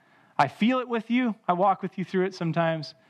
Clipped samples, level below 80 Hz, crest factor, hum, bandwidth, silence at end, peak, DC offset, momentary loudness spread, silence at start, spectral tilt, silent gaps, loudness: under 0.1%; -86 dBFS; 20 dB; none; 10 kHz; 0.2 s; -6 dBFS; under 0.1%; 5 LU; 0.4 s; -7 dB/octave; none; -26 LUFS